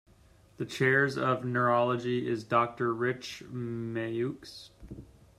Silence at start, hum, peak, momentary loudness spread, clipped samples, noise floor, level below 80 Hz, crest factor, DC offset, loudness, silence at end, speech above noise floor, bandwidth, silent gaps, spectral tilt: 0.6 s; none; -12 dBFS; 21 LU; under 0.1%; -60 dBFS; -62 dBFS; 20 dB; under 0.1%; -30 LUFS; 0.35 s; 30 dB; 13.5 kHz; none; -6.5 dB/octave